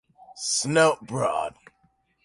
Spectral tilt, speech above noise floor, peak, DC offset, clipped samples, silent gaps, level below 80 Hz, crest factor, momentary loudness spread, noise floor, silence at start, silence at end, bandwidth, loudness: -3 dB/octave; 43 dB; -8 dBFS; under 0.1%; under 0.1%; none; -66 dBFS; 18 dB; 12 LU; -67 dBFS; 0.3 s; 0.75 s; 11.5 kHz; -24 LUFS